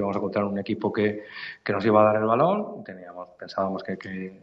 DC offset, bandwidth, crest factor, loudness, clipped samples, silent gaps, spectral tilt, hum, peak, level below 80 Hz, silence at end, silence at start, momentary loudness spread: under 0.1%; 7 kHz; 20 dB; -25 LUFS; under 0.1%; none; -8.5 dB/octave; none; -6 dBFS; -68 dBFS; 0.05 s; 0 s; 20 LU